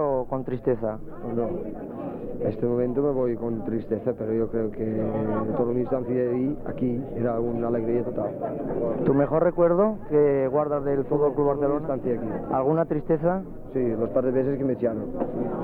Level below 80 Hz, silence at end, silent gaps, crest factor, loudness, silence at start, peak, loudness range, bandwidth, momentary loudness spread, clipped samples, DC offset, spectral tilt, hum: -44 dBFS; 0 s; none; 16 dB; -26 LUFS; 0 s; -8 dBFS; 5 LU; 4.1 kHz; 8 LU; under 0.1%; under 0.1%; -11.5 dB/octave; none